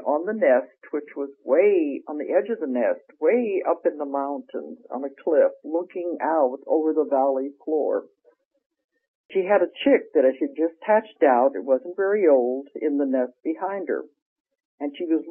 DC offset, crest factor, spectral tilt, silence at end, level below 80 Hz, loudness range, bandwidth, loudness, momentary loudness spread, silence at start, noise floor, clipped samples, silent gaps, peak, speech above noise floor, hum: under 0.1%; 16 dB; -3.5 dB/octave; 0 s; -82 dBFS; 4 LU; 3.6 kHz; -23 LUFS; 12 LU; 0 s; -63 dBFS; under 0.1%; 8.45-8.51 s, 8.66-8.70 s, 8.84-8.89 s, 9.08-9.29 s, 14.22-14.45 s, 14.65-14.78 s; -6 dBFS; 40 dB; none